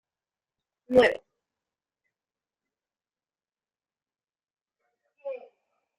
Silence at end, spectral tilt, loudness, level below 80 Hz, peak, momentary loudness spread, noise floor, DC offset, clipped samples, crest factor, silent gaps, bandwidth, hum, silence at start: 0.6 s; -2.5 dB/octave; -23 LUFS; -68 dBFS; -8 dBFS; 21 LU; under -90 dBFS; under 0.1%; under 0.1%; 26 dB; none; 7.4 kHz; none; 0.9 s